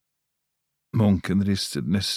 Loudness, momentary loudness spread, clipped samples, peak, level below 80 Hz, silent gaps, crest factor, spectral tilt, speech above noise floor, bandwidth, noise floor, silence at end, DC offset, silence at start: -24 LUFS; 4 LU; under 0.1%; -8 dBFS; -52 dBFS; none; 16 dB; -5.5 dB/octave; 57 dB; 15 kHz; -80 dBFS; 0 s; under 0.1%; 0.95 s